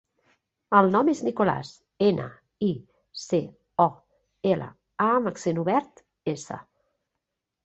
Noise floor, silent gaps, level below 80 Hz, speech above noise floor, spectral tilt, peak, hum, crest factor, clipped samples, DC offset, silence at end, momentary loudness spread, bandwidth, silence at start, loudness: -83 dBFS; none; -66 dBFS; 59 dB; -6.5 dB/octave; -4 dBFS; none; 22 dB; under 0.1%; under 0.1%; 1.05 s; 18 LU; 8.2 kHz; 0.7 s; -25 LUFS